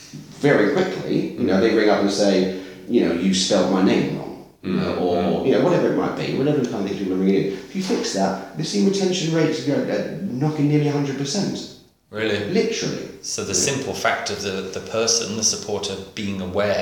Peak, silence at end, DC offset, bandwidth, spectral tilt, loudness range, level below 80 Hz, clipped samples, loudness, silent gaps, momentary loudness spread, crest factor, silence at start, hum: -4 dBFS; 0 s; under 0.1%; 17.5 kHz; -4.5 dB/octave; 4 LU; -58 dBFS; under 0.1%; -21 LUFS; none; 10 LU; 18 dB; 0 s; none